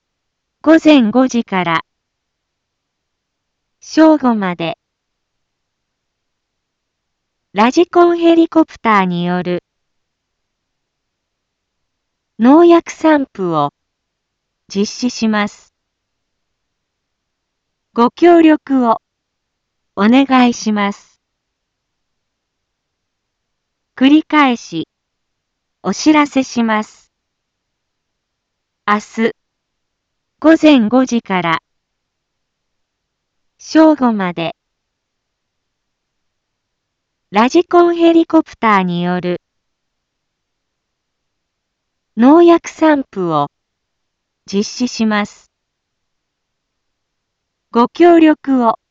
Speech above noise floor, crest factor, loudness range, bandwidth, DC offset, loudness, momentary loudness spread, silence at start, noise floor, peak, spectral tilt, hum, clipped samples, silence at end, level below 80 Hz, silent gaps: 62 dB; 16 dB; 8 LU; 7.6 kHz; under 0.1%; -12 LUFS; 13 LU; 0.65 s; -74 dBFS; 0 dBFS; -5.5 dB/octave; none; under 0.1%; 0.15 s; -58 dBFS; none